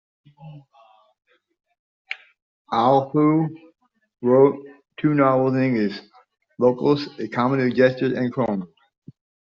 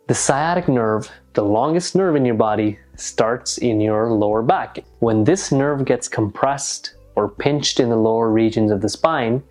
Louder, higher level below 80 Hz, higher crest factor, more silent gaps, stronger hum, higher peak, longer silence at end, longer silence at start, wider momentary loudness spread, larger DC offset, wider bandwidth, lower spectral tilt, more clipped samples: about the same, -20 LUFS vs -19 LUFS; second, -66 dBFS vs -50 dBFS; about the same, 20 dB vs 18 dB; first, 1.79-2.05 s, 2.42-2.65 s vs none; neither; about the same, -2 dBFS vs -2 dBFS; first, 0.85 s vs 0.1 s; first, 0.4 s vs 0.1 s; first, 17 LU vs 6 LU; neither; second, 6.8 kHz vs 11.5 kHz; about the same, -6 dB/octave vs -5 dB/octave; neither